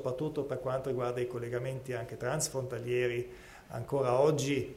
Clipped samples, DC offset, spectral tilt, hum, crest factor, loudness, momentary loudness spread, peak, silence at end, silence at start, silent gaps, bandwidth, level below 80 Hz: under 0.1%; under 0.1%; -5 dB/octave; none; 20 dB; -33 LUFS; 11 LU; -14 dBFS; 0 s; 0 s; none; 16 kHz; -60 dBFS